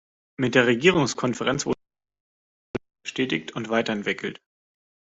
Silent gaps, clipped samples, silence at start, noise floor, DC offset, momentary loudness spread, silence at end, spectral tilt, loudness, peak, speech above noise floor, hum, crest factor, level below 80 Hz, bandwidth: 2.20-2.74 s; under 0.1%; 0.4 s; under -90 dBFS; under 0.1%; 15 LU; 0.85 s; -4.5 dB/octave; -24 LUFS; -4 dBFS; over 67 dB; none; 22 dB; -58 dBFS; 8 kHz